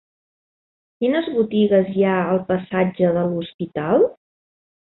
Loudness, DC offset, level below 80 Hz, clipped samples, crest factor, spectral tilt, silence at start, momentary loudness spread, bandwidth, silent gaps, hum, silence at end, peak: -20 LUFS; under 0.1%; -60 dBFS; under 0.1%; 16 dB; -12 dB/octave; 1 s; 7 LU; 4.1 kHz; 3.54-3.59 s; none; 0.7 s; -6 dBFS